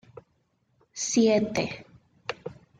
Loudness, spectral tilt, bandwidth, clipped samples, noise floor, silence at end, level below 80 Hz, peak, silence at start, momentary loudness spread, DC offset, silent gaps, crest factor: -26 LUFS; -4 dB/octave; 9.6 kHz; under 0.1%; -71 dBFS; 0.25 s; -64 dBFS; -10 dBFS; 0.95 s; 20 LU; under 0.1%; none; 18 dB